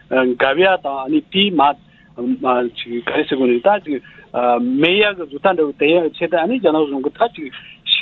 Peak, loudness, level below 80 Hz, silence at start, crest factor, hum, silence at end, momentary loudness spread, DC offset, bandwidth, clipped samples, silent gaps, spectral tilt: 0 dBFS; -17 LUFS; -58 dBFS; 0.1 s; 16 dB; none; 0 s; 11 LU; under 0.1%; 4.4 kHz; under 0.1%; none; -8 dB/octave